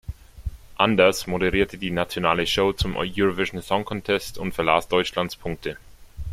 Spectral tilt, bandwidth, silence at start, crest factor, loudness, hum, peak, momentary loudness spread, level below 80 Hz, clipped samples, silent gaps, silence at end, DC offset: -4.5 dB/octave; 16 kHz; 0.1 s; 22 dB; -23 LUFS; none; -2 dBFS; 17 LU; -40 dBFS; under 0.1%; none; 0 s; under 0.1%